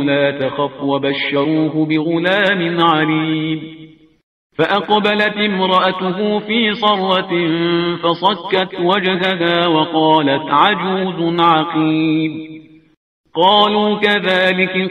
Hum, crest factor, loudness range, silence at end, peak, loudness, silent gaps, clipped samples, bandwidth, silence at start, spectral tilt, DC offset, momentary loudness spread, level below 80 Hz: none; 14 dB; 2 LU; 0 s; 0 dBFS; -15 LUFS; 4.23-4.50 s, 12.97-13.24 s; under 0.1%; 7.4 kHz; 0 s; -7 dB/octave; under 0.1%; 6 LU; -58 dBFS